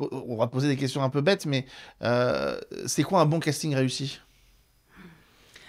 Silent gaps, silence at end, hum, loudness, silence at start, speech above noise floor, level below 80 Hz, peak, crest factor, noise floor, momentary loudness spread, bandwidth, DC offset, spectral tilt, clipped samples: none; 0.6 s; none; -26 LUFS; 0 s; 35 dB; -62 dBFS; -8 dBFS; 20 dB; -61 dBFS; 10 LU; 15.5 kHz; under 0.1%; -5.5 dB/octave; under 0.1%